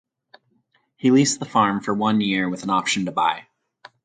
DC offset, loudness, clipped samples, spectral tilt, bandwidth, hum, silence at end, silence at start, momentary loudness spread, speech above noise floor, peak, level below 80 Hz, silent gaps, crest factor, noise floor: under 0.1%; -20 LUFS; under 0.1%; -4 dB/octave; 9.6 kHz; none; 0.65 s; 1.05 s; 6 LU; 46 dB; -4 dBFS; -64 dBFS; none; 18 dB; -66 dBFS